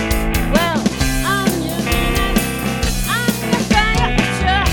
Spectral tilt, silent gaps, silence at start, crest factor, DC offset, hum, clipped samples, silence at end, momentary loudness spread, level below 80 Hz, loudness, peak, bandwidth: -4.5 dB/octave; none; 0 s; 16 dB; under 0.1%; none; under 0.1%; 0 s; 4 LU; -22 dBFS; -17 LUFS; 0 dBFS; 17.5 kHz